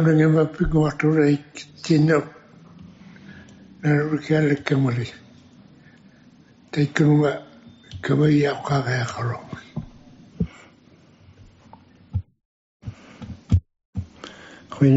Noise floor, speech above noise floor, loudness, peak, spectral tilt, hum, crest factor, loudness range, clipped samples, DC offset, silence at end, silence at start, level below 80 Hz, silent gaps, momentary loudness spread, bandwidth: -53 dBFS; 33 dB; -21 LUFS; -4 dBFS; -7 dB/octave; none; 20 dB; 13 LU; under 0.1%; under 0.1%; 0 s; 0 s; -44 dBFS; 12.45-12.80 s, 13.85-13.93 s; 22 LU; 8 kHz